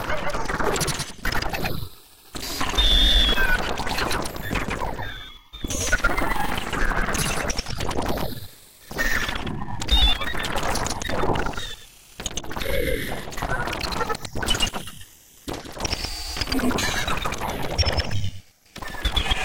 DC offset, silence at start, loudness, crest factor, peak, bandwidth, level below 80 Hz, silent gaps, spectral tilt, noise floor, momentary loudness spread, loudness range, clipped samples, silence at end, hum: 1%; 0 s; -25 LUFS; 18 dB; -6 dBFS; 17 kHz; -30 dBFS; none; -3 dB/octave; -45 dBFS; 15 LU; 5 LU; under 0.1%; 0 s; none